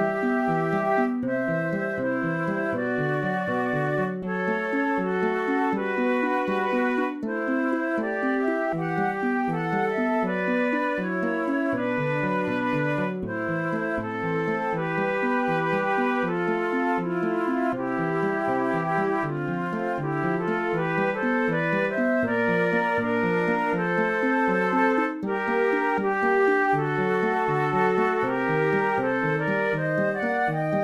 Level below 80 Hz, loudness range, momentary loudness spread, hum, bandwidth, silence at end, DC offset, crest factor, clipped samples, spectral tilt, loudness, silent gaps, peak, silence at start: -58 dBFS; 3 LU; 4 LU; none; 12.5 kHz; 0 s; under 0.1%; 14 dB; under 0.1%; -8 dB/octave; -25 LUFS; none; -10 dBFS; 0 s